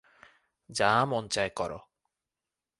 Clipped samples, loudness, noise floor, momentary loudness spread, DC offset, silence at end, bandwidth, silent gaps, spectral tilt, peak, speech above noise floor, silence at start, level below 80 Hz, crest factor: under 0.1%; -29 LUFS; -90 dBFS; 13 LU; under 0.1%; 1 s; 11.5 kHz; none; -3.5 dB/octave; -10 dBFS; 61 dB; 0.7 s; -62 dBFS; 22 dB